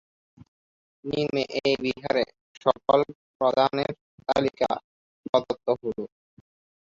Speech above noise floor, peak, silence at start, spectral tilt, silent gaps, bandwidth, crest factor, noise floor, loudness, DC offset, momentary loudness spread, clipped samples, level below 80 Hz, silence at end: over 65 dB; -6 dBFS; 1.05 s; -6 dB/octave; 2.41-2.61 s, 3.15-3.40 s, 4.01-4.18 s, 4.84-5.23 s, 5.29-5.33 s; 7.6 kHz; 22 dB; under -90 dBFS; -26 LUFS; under 0.1%; 11 LU; under 0.1%; -62 dBFS; 0.8 s